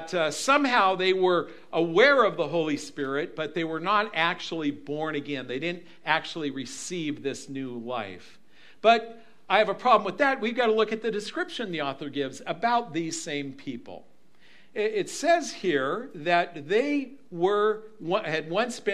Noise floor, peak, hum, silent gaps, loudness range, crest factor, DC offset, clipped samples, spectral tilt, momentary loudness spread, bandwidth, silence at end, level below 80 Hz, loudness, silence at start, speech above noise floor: -59 dBFS; -4 dBFS; none; none; 7 LU; 22 dB; 0.4%; under 0.1%; -4 dB/octave; 12 LU; 13.5 kHz; 0 s; -76 dBFS; -26 LUFS; 0 s; 33 dB